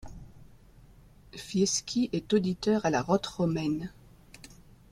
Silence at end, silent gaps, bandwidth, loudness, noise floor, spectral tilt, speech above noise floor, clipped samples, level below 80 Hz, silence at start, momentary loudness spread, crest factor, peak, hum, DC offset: 1 s; none; 14 kHz; -29 LUFS; -55 dBFS; -5 dB/octave; 27 dB; under 0.1%; -56 dBFS; 0.05 s; 22 LU; 18 dB; -12 dBFS; none; under 0.1%